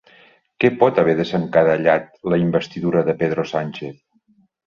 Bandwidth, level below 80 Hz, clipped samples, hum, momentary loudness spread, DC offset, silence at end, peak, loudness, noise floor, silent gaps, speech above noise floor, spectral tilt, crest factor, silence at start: 7.2 kHz; -56 dBFS; under 0.1%; none; 9 LU; under 0.1%; 0.75 s; -2 dBFS; -19 LUFS; -59 dBFS; none; 41 dB; -7.5 dB/octave; 18 dB; 0.6 s